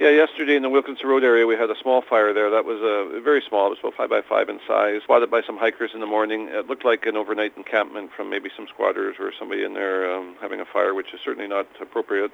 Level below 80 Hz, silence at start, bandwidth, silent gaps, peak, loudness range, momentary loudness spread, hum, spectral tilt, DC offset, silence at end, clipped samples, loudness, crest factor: -74 dBFS; 0 s; 6.2 kHz; none; -4 dBFS; 6 LU; 11 LU; none; -4.5 dB/octave; under 0.1%; 0.05 s; under 0.1%; -22 LUFS; 18 dB